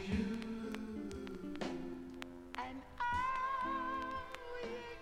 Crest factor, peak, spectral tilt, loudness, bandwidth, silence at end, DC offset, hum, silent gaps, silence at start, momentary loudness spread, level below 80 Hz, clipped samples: 18 dB; -24 dBFS; -5.5 dB/octave; -42 LUFS; 16 kHz; 0 s; under 0.1%; none; none; 0 s; 10 LU; -56 dBFS; under 0.1%